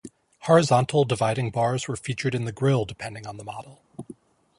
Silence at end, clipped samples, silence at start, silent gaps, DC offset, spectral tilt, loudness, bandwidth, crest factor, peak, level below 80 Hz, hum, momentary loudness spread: 0.45 s; under 0.1%; 0.05 s; none; under 0.1%; -6 dB/octave; -23 LUFS; 11.5 kHz; 20 dB; -4 dBFS; -58 dBFS; none; 23 LU